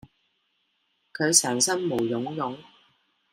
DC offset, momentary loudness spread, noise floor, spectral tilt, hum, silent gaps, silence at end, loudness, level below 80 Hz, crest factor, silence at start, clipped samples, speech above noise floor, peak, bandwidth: under 0.1%; 17 LU; -73 dBFS; -2.5 dB/octave; none; none; 0.7 s; -24 LUFS; -70 dBFS; 26 dB; 1.15 s; under 0.1%; 48 dB; -2 dBFS; 16 kHz